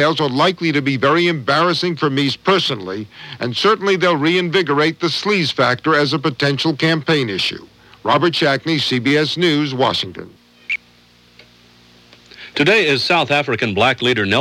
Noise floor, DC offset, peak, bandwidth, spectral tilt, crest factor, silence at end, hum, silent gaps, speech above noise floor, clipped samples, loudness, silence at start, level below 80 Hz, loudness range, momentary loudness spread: -50 dBFS; under 0.1%; -2 dBFS; 14 kHz; -5 dB/octave; 16 dB; 0 s; none; none; 34 dB; under 0.1%; -16 LUFS; 0 s; -58 dBFS; 4 LU; 9 LU